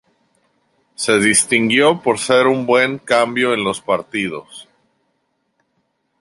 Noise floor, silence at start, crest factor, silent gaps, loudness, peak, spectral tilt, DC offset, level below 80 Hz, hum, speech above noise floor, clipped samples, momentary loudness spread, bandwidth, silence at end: -68 dBFS; 1 s; 16 dB; none; -15 LUFS; -2 dBFS; -3 dB/octave; under 0.1%; -60 dBFS; none; 52 dB; under 0.1%; 10 LU; 11.5 kHz; 1.6 s